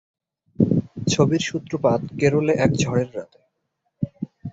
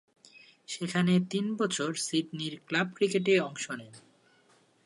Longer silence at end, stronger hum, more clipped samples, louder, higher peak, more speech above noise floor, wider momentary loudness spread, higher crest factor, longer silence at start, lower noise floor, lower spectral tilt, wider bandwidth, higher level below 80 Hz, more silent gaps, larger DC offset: second, 0 s vs 0.85 s; neither; neither; first, -22 LUFS vs -30 LUFS; first, -2 dBFS vs -12 dBFS; first, 54 dB vs 35 dB; about the same, 12 LU vs 11 LU; about the same, 20 dB vs 18 dB; first, 0.6 s vs 0.35 s; first, -75 dBFS vs -65 dBFS; first, -6 dB/octave vs -4.5 dB/octave; second, 8 kHz vs 11.5 kHz; first, -50 dBFS vs -78 dBFS; neither; neither